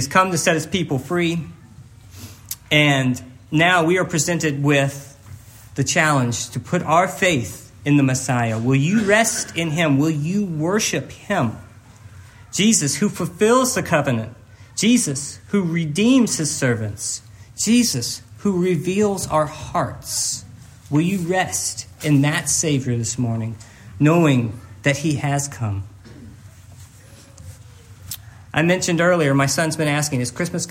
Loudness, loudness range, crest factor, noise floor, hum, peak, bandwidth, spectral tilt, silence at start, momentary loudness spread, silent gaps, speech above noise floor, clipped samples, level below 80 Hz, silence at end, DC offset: -19 LUFS; 3 LU; 20 dB; -44 dBFS; none; 0 dBFS; 16.5 kHz; -4.5 dB/octave; 0 s; 12 LU; none; 26 dB; under 0.1%; -54 dBFS; 0 s; under 0.1%